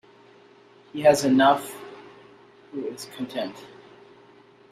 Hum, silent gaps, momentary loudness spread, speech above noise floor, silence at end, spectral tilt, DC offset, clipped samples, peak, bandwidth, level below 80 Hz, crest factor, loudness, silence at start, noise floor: none; none; 24 LU; 31 dB; 1.05 s; -4.5 dB/octave; under 0.1%; under 0.1%; -6 dBFS; 15 kHz; -68 dBFS; 20 dB; -23 LUFS; 0.95 s; -53 dBFS